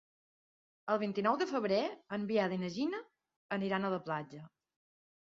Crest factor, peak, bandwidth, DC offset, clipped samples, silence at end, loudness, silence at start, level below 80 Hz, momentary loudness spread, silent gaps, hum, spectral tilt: 20 dB; -18 dBFS; 7.4 kHz; under 0.1%; under 0.1%; 0.75 s; -35 LUFS; 0.85 s; -80 dBFS; 10 LU; 3.36-3.49 s; none; -4.5 dB/octave